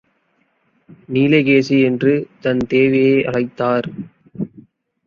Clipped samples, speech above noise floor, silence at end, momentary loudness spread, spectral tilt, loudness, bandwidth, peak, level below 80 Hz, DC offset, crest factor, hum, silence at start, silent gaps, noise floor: under 0.1%; 48 dB; 0.6 s; 16 LU; -7.5 dB/octave; -16 LUFS; 7 kHz; -2 dBFS; -56 dBFS; under 0.1%; 16 dB; none; 1.1 s; none; -63 dBFS